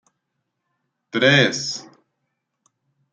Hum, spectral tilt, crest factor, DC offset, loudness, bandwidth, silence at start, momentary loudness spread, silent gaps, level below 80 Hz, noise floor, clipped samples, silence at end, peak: none; -4 dB/octave; 22 dB; under 0.1%; -18 LUFS; 9.2 kHz; 1.15 s; 14 LU; none; -64 dBFS; -77 dBFS; under 0.1%; 1.3 s; -2 dBFS